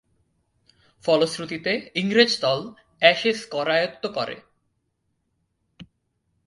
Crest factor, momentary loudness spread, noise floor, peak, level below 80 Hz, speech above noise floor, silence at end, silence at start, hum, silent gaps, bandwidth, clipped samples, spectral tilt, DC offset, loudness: 24 dB; 12 LU; -74 dBFS; 0 dBFS; -66 dBFS; 51 dB; 0.65 s; 1.05 s; none; none; 11.5 kHz; under 0.1%; -4 dB/octave; under 0.1%; -22 LUFS